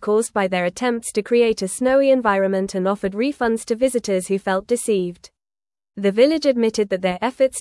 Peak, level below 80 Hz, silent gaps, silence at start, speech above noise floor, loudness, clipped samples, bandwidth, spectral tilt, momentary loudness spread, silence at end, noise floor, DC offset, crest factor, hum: -4 dBFS; -54 dBFS; none; 0 s; over 71 dB; -20 LUFS; under 0.1%; 12 kHz; -4.5 dB/octave; 6 LU; 0 s; under -90 dBFS; under 0.1%; 16 dB; none